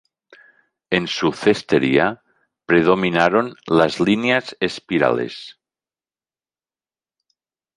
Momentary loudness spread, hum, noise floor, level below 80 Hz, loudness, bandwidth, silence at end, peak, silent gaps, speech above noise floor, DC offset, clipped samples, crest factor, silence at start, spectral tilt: 9 LU; none; under -90 dBFS; -56 dBFS; -18 LUFS; 11 kHz; 2.25 s; 0 dBFS; none; over 72 dB; under 0.1%; under 0.1%; 20 dB; 0.9 s; -5.5 dB/octave